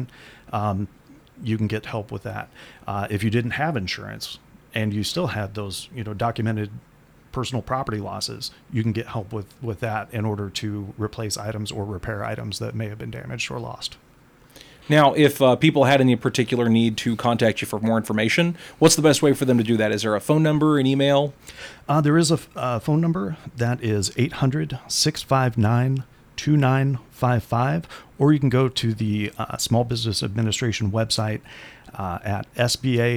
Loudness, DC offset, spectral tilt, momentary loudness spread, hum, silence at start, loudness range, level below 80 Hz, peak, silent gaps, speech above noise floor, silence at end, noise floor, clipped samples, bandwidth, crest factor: -22 LUFS; under 0.1%; -5.5 dB/octave; 15 LU; none; 0 s; 9 LU; -52 dBFS; -4 dBFS; none; 31 dB; 0 s; -53 dBFS; under 0.1%; 18 kHz; 18 dB